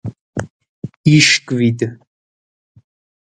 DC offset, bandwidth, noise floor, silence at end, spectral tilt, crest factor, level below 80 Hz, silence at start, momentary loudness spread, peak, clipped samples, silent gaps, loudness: under 0.1%; 11 kHz; under -90 dBFS; 1.3 s; -4 dB/octave; 18 dB; -50 dBFS; 0.05 s; 23 LU; 0 dBFS; under 0.1%; 0.21-0.33 s, 0.50-0.60 s, 0.69-0.82 s, 0.97-1.04 s; -13 LUFS